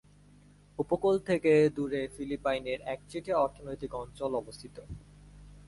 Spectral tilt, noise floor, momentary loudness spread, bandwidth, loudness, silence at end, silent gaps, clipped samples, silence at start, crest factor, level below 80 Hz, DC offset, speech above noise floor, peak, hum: -6.5 dB/octave; -58 dBFS; 21 LU; 11.5 kHz; -31 LUFS; 0.1 s; none; under 0.1%; 0.8 s; 18 dB; -56 dBFS; under 0.1%; 27 dB; -14 dBFS; 50 Hz at -55 dBFS